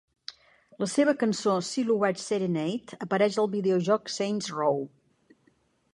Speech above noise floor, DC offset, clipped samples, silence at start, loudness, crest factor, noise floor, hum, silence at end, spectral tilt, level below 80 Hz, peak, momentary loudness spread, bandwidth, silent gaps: 41 dB; under 0.1%; under 0.1%; 0.3 s; -27 LUFS; 18 dB; -67 dBFS; none; 1.05 s; -5 dB/octave; -74 dBFS; -10 dBFS; 10 LU; 11.5 kHz; none